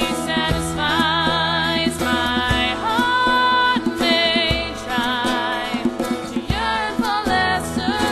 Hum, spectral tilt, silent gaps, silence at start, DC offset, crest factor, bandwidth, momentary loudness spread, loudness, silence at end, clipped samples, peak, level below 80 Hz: none; -4 dB/octave; none; 0 s; under 0.1%; 16 dB; 13.5 kHz; 7 LU; -19 LUFS; 0 s; under 0.1%; -4 dBFS; -36 dBFS